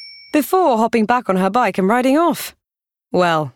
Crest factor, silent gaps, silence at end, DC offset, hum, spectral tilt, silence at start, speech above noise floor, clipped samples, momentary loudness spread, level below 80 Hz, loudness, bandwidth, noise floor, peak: 14 dB; none; 0.05 s; under 0.1%; none; -5.5 dB/octave; 0 s; 71 dB; under 0.1%; 7 LU; -60 dBFS; -16 LUFS; 19 kHz; -86 dBFS; -2 dBFS